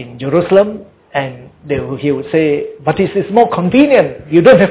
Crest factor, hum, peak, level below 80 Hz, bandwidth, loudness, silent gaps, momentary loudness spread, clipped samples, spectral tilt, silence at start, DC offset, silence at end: 12 dB; none; 0 dBFS; -44 dBFS; 4 kHz; -13 LUFS; none; 11 LU; under 0.1%; -11 dB/octave; 0 s; under 0.1%; 0 s